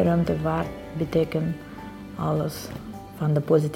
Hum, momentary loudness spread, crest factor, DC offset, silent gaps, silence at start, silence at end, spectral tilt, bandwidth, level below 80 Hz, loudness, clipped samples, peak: none; 16 LU; 18 dB; under 0.1%; none; 0 s; 0 s; -7.5 dB/octave; 16.5 kHz; -46 dBFS; -26 LUFS; under 0.1%; -8 dBFS